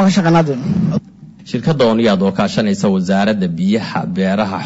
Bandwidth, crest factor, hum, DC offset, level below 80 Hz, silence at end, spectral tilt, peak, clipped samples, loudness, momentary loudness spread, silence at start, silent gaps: 8 kHz; 10 dB; none; under 0.1%; -48 dBFS; 0 s; -6.5 dB/octave; -4 dBFS; under 0.1%; -15 LUFS; 7 LU; 0 s; none